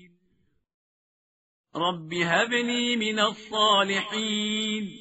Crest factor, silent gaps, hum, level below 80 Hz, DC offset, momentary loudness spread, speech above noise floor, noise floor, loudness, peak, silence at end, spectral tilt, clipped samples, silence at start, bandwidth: 20 dB; none; none; -70 dBFS; under 0.1%; 8 LU; 45 dB; -70 dBFS; -25 LUFS; -8 dBFS; 0 s; -1.5 dB/octave; under 0.1%; 1.75 s; 8 kHz